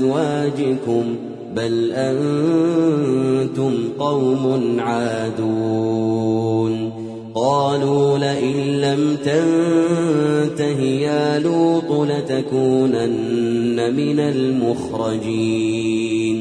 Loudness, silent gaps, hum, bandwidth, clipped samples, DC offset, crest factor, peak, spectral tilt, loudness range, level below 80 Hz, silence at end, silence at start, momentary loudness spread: -19 LUFS; none; none; 10.5 kHz; under 0.1%; under 0.1%; 14 dB; -4 dBFS; -7 dB/octave; 2 LU; -58 dBFS; 0 s; 0 s; 5 LU